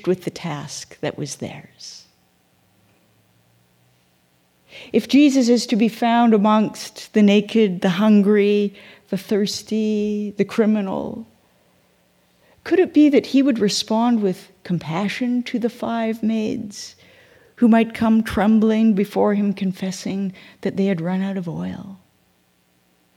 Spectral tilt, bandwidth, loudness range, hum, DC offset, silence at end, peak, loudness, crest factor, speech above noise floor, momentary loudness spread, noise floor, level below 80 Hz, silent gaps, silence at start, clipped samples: -6 dB/octave; 14.5 kHz; 9 LU; none; under 0.1%; 1.2 s; -4 dBFS; -19 LUFS; 16 dB; 43 dB; 16 LU; -61 dBFS; -56 dBFS; none; 0.05 s; under 0.1%